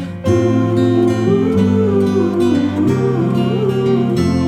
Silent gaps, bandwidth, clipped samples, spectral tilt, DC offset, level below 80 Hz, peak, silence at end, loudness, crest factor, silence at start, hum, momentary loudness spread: none; 14 kHz; under 0.1%; -8 dB/octave; under 0.1%; -44 dBFS; -2 dBFS; 0 s; -15 LUFS; 12 dB; 0 s; none; 2 LU